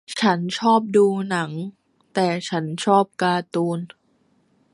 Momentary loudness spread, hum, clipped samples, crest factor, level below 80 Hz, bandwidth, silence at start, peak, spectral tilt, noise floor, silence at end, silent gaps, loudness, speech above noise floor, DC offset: 12 LU; none; under 0.1%; 18 dB; -70 dBFS; 11.5 kHz; 0.1 s; -4 dBFS; -5.5 dB/octave; -63 dBFS; 0.85 s; none; -21 LUFS; 43 dB; under 0.1%